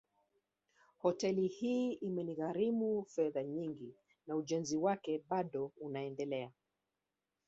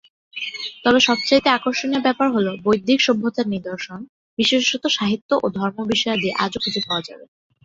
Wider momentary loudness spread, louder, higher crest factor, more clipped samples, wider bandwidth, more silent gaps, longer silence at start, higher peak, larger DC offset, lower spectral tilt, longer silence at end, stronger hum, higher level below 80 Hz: second, 8 LU vs 13 LU; second, -38 LUFS vs -19 LUFS; about the same, 18 dB vs 20 dB; neither; about the same, 8 kHz vs 7.8 kHz; second, none vs 4.09-4.37 s, 5.21-5.29 s; first, 1.05 s vs 0.35 s; second, -20 dBFS vs -2 dBFS; neither; first, -6 dB/octave vs -4 dB/octave; first, 0.95 s vs 0.4 s; neither; second, -80 dBFS vs -58 dBFS